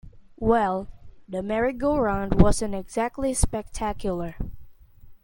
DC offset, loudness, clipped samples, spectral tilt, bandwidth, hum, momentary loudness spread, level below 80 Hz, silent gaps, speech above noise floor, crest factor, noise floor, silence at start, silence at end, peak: under 0.1%; -25 LUFS; under 0.1%; -6 dB/octave; 17 kHz; none; 14 LU; -34 dBFS; none; 24 dB; 22 dB; -47 dBFS; 0.05 s; 0.1 s; -2 dBFS